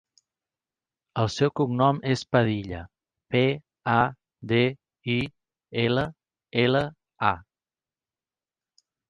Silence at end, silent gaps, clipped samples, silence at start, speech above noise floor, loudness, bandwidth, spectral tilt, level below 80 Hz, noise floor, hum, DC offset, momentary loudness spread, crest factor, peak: 1.7 s; none; under 0.1%; 1.15 s; over 66 dB; -26 LUFS; 9.4 kHz; -6.5 dB/octave; -54 dBFS; under -90 dBFS; none; under 0.1%; 12 LU; 22 dB; -4 dBFS